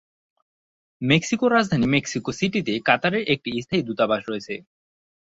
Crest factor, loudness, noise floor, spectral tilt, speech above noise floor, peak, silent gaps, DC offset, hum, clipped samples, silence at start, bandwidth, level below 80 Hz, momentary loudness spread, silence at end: 20 dB; -22 LUFS; under -90 dBFS; -5 dB/octave; over 68 dB; -4 dBFS; none; under 0.1%; none; under 0.1%; 1 s; 8 kHz; -56 dBFS; 11 LU; 0.7 s